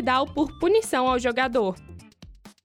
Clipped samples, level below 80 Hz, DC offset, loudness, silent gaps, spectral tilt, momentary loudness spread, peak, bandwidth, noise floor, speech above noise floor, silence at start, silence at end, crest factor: under 0.1%; -48 dBFS; under 0.1%; -23 LUFS; none; -4 dB/octave; 6 LU; -10 dBFS; 16.5 kHz; -48 dBFS; 25 dB; 0 s; 0.15 s; 14 dB